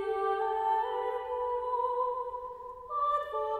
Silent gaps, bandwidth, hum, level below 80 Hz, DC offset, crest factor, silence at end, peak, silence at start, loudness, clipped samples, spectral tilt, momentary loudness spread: none; 10.5 kHz; none; -64 dBFS; under 0.1%; 12 dB; 0 s; -20 dBFS; 0 s; -32 LUFS; under 0.1%; -5 dB/octave; 9 LU